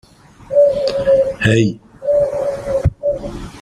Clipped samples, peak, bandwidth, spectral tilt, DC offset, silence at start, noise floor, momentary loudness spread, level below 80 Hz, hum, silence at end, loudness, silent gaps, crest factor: under 0.1%; -2 dBFS; 10.5 kHz; -6.5 dB/octave; under 0.1%; 0.5 s; -37 dBFS; 8 LU; -34 dBFS; none; 0 s; -16 LUFS; none; 14 dB